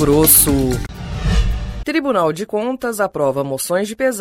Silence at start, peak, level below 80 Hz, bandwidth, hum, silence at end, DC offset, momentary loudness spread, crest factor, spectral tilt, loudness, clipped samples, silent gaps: 0 s; 0 dBFS; -26 dBFS; 18 kHz; none; 0 s; under 0.1%; 14 LU; 16 dB; -4 dB/octave; -16 LUFS; under 0.1%; none